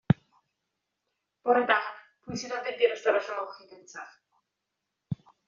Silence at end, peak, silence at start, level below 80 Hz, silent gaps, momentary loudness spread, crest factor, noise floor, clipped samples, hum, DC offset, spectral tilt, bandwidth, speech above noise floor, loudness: 0.35 s; -6 dBFS; 0.1 s; -66 dBFS; none; 21 LU; 24 dB; -84 dBFS; under 0.1%; none; under 0.1%; -4.5 dB/octave; 7.4 kHz; 56 dB; -29 LUFS